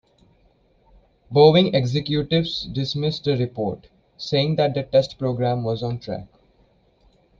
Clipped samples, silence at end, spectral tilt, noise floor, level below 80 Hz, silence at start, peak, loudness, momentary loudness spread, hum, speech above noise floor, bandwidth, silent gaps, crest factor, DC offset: under 0.1%; 1.15 s; -7 dB/octave; -60 dBFS; -52 dBFS; 1.3 s; -4 dBFS; -21 LUFS; 14 LU; none; 39 dB; 7.4 kHz; none; 20 dB; under 0.1%